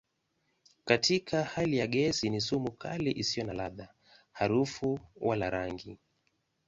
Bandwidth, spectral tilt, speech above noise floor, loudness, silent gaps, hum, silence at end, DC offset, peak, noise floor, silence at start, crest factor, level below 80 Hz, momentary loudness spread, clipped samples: 8 kHz; -4.5 dB/octave; 46 dB; -31 LUFS; none; none; 0.75 s; under 0.1%; -8 dBFS; -78 dBFS; 0.85 s; 24 dB; -60 dBFS; 12 LU; under 0.1%